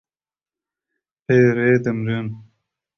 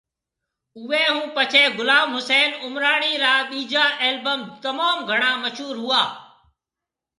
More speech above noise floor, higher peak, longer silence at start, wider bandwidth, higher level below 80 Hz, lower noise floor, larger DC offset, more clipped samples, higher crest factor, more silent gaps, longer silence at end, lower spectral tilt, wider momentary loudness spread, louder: first, over 73 dB vs 66 dB; about the same, -4 dBFS vs -2 dBFS; first, 1.3 s vs 0.75 s; second, 6.6 kHz vs 11.5 kHz; first, -58 dBFS vs -76 dBFS; about the same, under -90 dBFS vs -87 dBFS; neither; neither; about the same, 18 dB vs 20 dB; neither; second, 0.55 s vs 0.95 s; first, -8.5 dB/octave vs -1.5 dB/octave; first, 15 LU vs 10 LU; about the same, -18 LUFS vs -19 LUFS